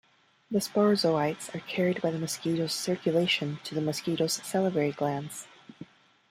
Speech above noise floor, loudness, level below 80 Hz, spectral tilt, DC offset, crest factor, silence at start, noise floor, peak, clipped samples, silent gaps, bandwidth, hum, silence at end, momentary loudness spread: 22 dB; -29 LUFS; -72 dBFS; -4.5 dB/octave; under 0.1%; 18 dB; 0.5 s; -50 dBFS; -12 dBFS; under 0.1%; none; 16 kHz; none; 0.45 s; 12 LU